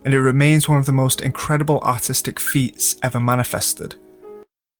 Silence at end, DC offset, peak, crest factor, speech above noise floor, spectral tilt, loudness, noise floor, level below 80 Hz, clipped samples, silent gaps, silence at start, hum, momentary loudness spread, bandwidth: 0.4 s; under 0.1%; -4 dBFS; 16 dB; 25 dB; -4.5 dB/octave; -18 LUFS; -43 dBFS; -50 dBFS; under 0.1%; none; 0.05 s; none; 6 LU; over 20 kHz